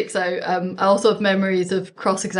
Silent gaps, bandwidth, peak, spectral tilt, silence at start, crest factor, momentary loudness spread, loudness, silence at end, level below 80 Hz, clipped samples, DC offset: none; 11 kHz; -4 dBFS; -4.5 dB/octave; 0 s; 16 dB; 6 LU; -20 LUFS; 0 s; -68 dBFS; under 0.1%; under 0.1%